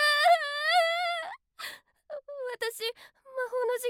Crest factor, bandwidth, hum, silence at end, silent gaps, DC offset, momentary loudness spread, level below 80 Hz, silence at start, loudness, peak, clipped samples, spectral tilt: 16 dB; 17 kHz; none; 0 s; none; under 0.1%; 18 LU; -82 dBFS; 0 s; -28 LUFS; -14 dBFS; under 0.1%; 2.5 dB/octave